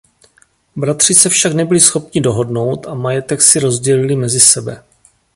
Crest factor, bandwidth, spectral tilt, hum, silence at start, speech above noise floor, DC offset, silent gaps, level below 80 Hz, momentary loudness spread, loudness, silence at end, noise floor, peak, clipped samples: 14 dB; 16 kHz; -3 dB/octave; none; 0.75 s; 41 dB; under 0.1%; none; -50 dBFS; 12 LU; -11 LUFS; 0.55 s; -53 dBFS; 0 dBFS; 0.3%